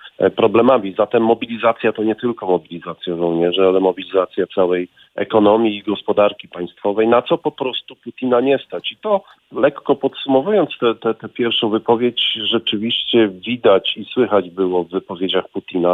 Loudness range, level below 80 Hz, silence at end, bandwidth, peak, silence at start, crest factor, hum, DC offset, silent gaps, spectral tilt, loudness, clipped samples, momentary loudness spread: 2 LU; -60 dBFS; 0 s; 4.1 kHz; -2 dBFS; 0.05 s; 16 dB; none; under 0.1%; none; -7.5 dB/octave; -17 LUFS; under 0.1%; 9 LU